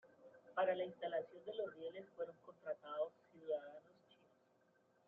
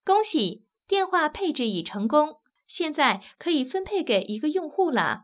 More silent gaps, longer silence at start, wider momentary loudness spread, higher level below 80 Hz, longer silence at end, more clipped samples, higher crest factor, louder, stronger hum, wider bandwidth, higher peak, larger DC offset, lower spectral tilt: neither; about the same, 0.05 s vs 0.05 s; first, 17 LU vs 7 LU; second, under -90 dBFS vs -62 dBFS; first, 1.25 s vs 0.05 s; neither; about the same, 20 dB vs 18 dB; second, -46 LUFS vs -25 LUFS; neither; first, 4.6 kHz vs 4 kHz; second, -28 dBFS vs -8 dBFS; neither; second, -2.5 dB/octave vs -8.5 dB/octave